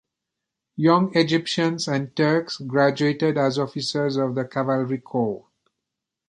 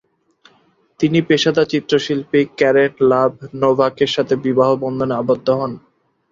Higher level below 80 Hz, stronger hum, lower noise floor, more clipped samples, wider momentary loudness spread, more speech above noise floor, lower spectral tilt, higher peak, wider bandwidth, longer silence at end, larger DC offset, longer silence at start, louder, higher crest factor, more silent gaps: second, -66 dBFS vs -56 dBFS; neither; first, -84 dBFS vs -57 dBFS; neither; about the same, 7 LU vs 6 LU; first, 62 dB vs 41 dB; about the same, -6 dB/octave vs -6 dB/octave; about the same, -4 dBFS vs -2 dBFS; first, 11.5 kHz vs 7.6 kHz; first, 0.9 s vs 0.55 s; neither; second, 0.75 s vs 1 s; second, -22 LUFS vs -16 LUFS; about the same, 20 dB vs 16 dB; neither